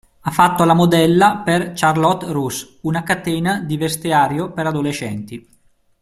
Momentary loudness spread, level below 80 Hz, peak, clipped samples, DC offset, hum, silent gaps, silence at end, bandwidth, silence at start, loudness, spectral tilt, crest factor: 12 LU; -50 dBFS; 0 dBFS; under 0.1%; under 0.1%; none; none; 0.6 s; 15.5 kHz; 0.25 s; -17 LUFS; -5.5 dB/octave; 18 dB